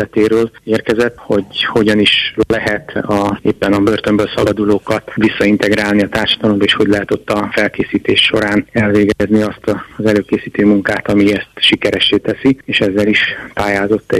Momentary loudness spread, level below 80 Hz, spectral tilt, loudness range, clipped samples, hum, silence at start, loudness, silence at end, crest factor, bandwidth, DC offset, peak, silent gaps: 6 LU; -42 dBFS; -5.5 dB/octave; 1 LU; under 0.1%; none; 0 s; -13 LUFS; 0 s; 12 dB; 14 kHz; under 0.1%; -2 dBFS; none